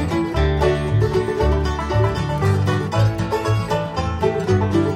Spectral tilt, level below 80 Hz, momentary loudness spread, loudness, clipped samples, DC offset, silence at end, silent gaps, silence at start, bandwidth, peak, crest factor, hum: -7 dB/octave; -28 dBFS; 3 LU; -20 LUFS; under 0.1%; under 0.1%; 0 s; none; 0 s; 12.5 kHz; -6 dBFS; 14 dB; none